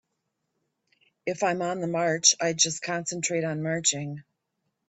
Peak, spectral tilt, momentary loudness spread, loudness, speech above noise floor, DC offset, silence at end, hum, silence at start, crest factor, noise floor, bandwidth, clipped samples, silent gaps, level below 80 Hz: -6 dBFS; -2.5 dB/octave; 14 LU; -25 LUFS; 53 dB; under 0.1%; 0.65 s; none; 1.25 s; 22 dB; -80 dBFS; 8.4 kHz; under 0.1%; none; -72 dBFS